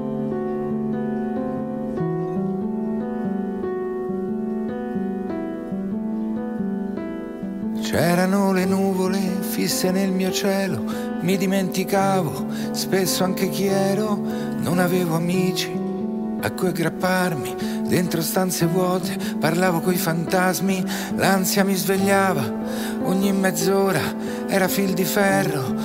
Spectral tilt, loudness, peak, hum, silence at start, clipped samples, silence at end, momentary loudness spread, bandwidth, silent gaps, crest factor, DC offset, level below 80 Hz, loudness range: -5 dB/octave; -22 LUFS; -4 dBFS; none; 0 s; under 0.1%; 0 s; 7 LU; 16 kHz; none; 18 dB; under 0.1%; -54 dBFS; 6 LU